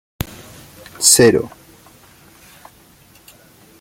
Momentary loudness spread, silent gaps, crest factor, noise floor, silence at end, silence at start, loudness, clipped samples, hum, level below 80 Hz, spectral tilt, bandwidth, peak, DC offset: 22 LU; none; 20 dB; -48 dBFS; 2.35 s; 1 s; -12 LUFS; under 0.1%; none; -46 dBFS; -2.5 dB/octave; 17 kHz; 0 dBFS; under 0.1%